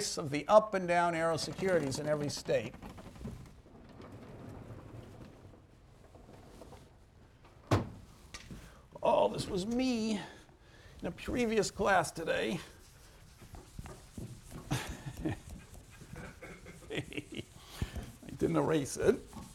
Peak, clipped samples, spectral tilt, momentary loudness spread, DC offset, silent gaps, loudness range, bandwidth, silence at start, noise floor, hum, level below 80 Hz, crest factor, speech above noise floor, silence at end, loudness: -12 dBFS; under 0.1%; -5 dB/octave; 23 LU; under 0.1%; none; 17 LU; 16.5 kHz; 0 s; -60 dBFS; none; -54 dBFS; 24 dB; 28 dB; 0 s; -33 LUFS